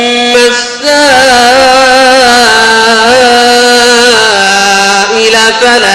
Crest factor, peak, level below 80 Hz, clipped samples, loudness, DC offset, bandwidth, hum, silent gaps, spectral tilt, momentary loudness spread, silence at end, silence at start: 4 dB; 0 dBFS; -38 dBFS; 1%; -4 LUFS; under 0.1%; 16.5 kHz; none; none; -1 dB/octave; 3 LU; 0 s; 0 s